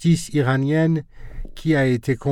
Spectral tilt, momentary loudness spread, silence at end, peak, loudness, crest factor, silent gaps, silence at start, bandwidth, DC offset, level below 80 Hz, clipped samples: -7 dB/octave; 21 LU; 0 s; -6 dBFS; -20 LUFS; 14 dB; none; 0 s; 12.5 kHz; under 0.1%; -40 dBFS; under 0.1%